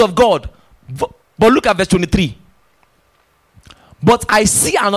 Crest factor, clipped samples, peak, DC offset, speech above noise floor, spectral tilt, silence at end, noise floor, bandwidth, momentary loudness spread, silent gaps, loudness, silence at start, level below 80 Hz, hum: 14 dB; under 0.1%; -2 dBFS; under 0.1%; 44 dB; -4 dB/octave; 0 s; -57 dBFS; 16 kHz; 13 LU; none; -14 LUFS; 0 s; -34 dBFS; none